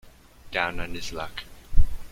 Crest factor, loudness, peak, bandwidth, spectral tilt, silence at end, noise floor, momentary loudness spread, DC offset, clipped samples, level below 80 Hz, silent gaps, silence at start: 18 dB; -31 LUFS; -4 dBFS; 7.4 kHz; -4.5 dB/octave; 0.05 s; -47 dBFS; 8 LU; under 0.1%; under 0.1%; -28 dBFS; none; 0.45 s